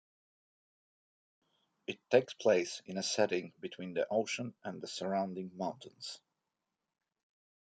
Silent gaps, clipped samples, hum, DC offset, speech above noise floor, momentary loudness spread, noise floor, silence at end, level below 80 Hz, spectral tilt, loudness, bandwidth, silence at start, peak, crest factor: none; under 0.1%; none; under 0.1%; 53 dB; 15 LU; -89 dBFS; 1.45 s; -86 dBFS; -4 dB/octave; -35 LUFS; 9.4 kHz; 1.9 s; -12 dBFS; 24 dB